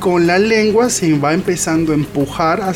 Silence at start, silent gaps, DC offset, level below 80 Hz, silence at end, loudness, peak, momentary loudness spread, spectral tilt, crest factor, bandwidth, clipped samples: 0 s; none; under 0.1%; -42 dBFS; 0 s; -14 LUFS; -2 dBFS; 4 LU; -5 dB/octave; 12 dB; 16.5 kHz; under 0.1%